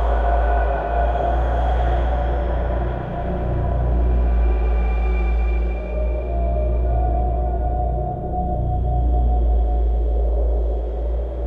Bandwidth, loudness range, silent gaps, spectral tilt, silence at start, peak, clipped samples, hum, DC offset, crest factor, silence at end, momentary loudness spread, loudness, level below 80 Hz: 3.7 kHz; 1 LU; none; -10 dB/octave; 0 s; -8 dBFS; under 0.1%; none; 0.1%; 10 dB; 0 s; 5 LU; -22 LUFS; -20 dBFS